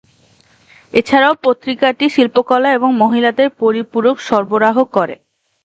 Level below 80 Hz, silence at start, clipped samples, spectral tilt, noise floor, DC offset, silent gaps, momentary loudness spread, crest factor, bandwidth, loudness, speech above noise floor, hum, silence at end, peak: -58 dBFS; 0.95 s; under 0.1%; -5.5 dB/octave; -51 dBFS; under 0.1%; none; 5 LU; 14 dB; 8.2 kHz; -14 LUFS; 38 dB; none; 0.5 s; 0 dBFS